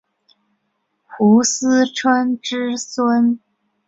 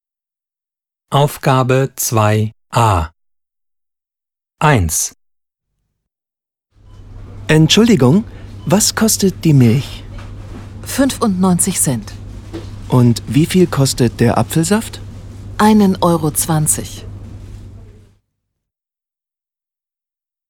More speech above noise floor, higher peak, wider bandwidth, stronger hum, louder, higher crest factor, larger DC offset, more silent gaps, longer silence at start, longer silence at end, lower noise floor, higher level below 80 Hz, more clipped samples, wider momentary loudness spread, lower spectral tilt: second, 54 dB vs 77 dB; about the same, -2 dBFS vs 0 dBFS; second, 8 kHz vs 19 kHz; neither; second, -17 LUFS vs -13 LUFS; about the same, 16 dB vs 16 dB; neither; neither; about the same, 1.1 s vs 1.1 s; second, 0.5 s vs 2.7 s; second, -70 dBFS vs -89 dBFS; second, -66 dBFS vs -36 dBFS; neither; second, 9 LU vs 21 LU; about the same, -4 dB/octave vs -5 dB/octave